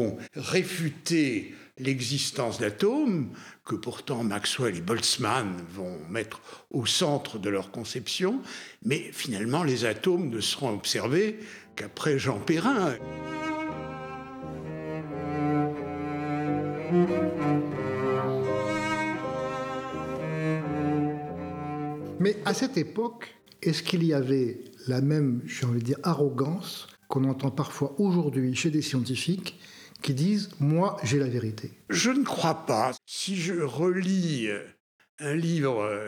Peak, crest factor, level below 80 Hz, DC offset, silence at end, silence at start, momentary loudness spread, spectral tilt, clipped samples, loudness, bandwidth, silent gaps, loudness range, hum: -6 dBFS; 22 dB; -64 dBFS; under 0.1%; 0 s; 0 s; 11 LU; -5 dB/octave; under 0.1%; -28 LUFS; 18 kHz; 34.80-34.99 s, 35.09-35.18 s; 3 LU; none